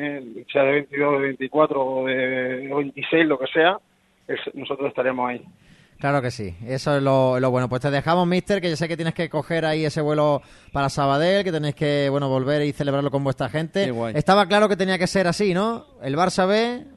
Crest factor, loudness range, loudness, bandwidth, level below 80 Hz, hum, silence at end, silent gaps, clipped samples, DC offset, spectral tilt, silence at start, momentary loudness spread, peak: 18 dB; 3 LU; -22 LUFS; 12 kHz; -54 dBFS; none; 0.1 s; none; under 0.1%; under 0.1%; -6 dB/octave; 0 s; 9 LU; -4 dBFS